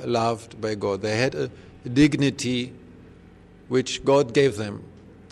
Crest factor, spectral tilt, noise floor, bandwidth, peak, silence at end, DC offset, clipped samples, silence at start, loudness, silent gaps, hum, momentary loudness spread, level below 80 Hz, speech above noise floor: 18 dB; -5.5 dB/octave; -49 dBFS; 12 kHz; -6 dBFS; 0.4 s; under 0.1%; under 0.1%; 0 s; -23 LUFS; none; none; 13 LU; -52 dBFS; 26 dB